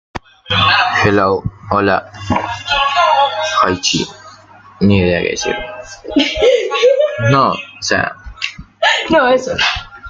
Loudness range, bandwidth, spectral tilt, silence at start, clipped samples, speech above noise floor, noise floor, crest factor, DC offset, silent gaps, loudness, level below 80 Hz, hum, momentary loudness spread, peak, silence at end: 2 LU; 9.2 kHz; -4 dB/octave; 0.15 s; under 0.1%; 26 dB; -40 dBFS; 14 dB; under 0.1%; none; -14 LUFS; -40 dBFS; none; 11 LU; 0 dBFS; 0 s